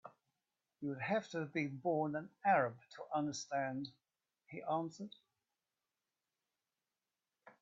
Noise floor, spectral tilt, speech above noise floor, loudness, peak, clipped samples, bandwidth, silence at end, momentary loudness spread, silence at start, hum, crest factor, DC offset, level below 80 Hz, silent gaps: under -90 dBFS; -4.5 dB/octave; over 51 dB; -39 LUFS; -22 dBFS; under 0.1%; 7.4 kHz; 0.1 s; 16 LU; 0.05 s; none; 20 dB; under 0.1%; -84 dBFS; none